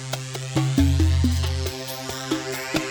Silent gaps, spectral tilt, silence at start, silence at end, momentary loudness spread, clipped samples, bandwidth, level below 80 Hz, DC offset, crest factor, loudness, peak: none; -5.5 dB/octave; 0 s; 0 s; 10 LU; under 0.1%; over 20 kHz; -30 dBFS; under 0.1%; 16 dB; -24 LUFS; -6 dBFS